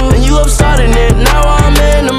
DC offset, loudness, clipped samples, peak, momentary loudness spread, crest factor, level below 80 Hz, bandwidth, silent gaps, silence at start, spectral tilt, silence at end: under 0.1%; -9 LUFS; 0.5%; 0 dBFS; 1 LU; 6 dB; -8 dBFS; 15.5 kHz; none; 0 s; -5 dB/octave; 0 s